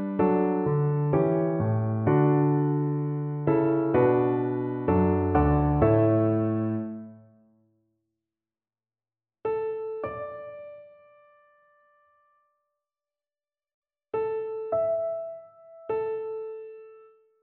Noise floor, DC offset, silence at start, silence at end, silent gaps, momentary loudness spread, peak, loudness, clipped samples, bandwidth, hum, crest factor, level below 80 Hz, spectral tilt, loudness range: under -90 dBFS; under 0.1%; 0 s; 0.45 s; 13.74-13.82 s; 17 LU; -10 dBFS; -26 LUFS; under 0.1%; 3.7 kHz; none; 18 dB; -46 dBFS; -13 dB/octave; 14 LU